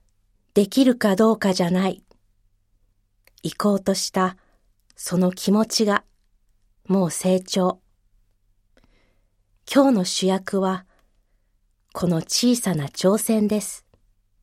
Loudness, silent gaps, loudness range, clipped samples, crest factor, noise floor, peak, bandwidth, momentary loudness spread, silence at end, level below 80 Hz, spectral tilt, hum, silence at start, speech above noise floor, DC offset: -21 LUFS; none; 4 LU; under 0.1%; 20 dB; -65 dBFS; -2 dBFS; 16 kHz; 9 LU; 0.65 s; -60 dBFS; -5 dB/octave; none; 0.55 s; 45 dB; under 0.1%